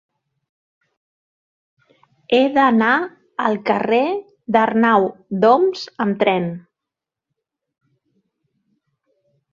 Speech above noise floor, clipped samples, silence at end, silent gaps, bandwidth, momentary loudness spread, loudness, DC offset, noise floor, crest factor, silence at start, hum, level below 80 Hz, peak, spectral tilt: 69 dB; under 0.1%; 2.95 s; none; 7.2 kHz; 9 LU; -17 LUFS; under 0.1%; -85 dBFS; 18 dB; 2.3 s; none; -66 dBFS; -2 dBFS; -6.5 dB/octave